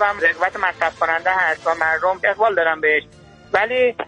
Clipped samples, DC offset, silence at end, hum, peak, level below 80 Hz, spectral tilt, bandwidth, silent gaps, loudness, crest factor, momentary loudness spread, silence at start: under 0.1%; under 0.1%; 0 s; none; -4 dBFS; -56 dBFS; -3.5 dB/octave; 9.8 kHz; none; -18 LUFS; 16 dB; 3 LU; 0 s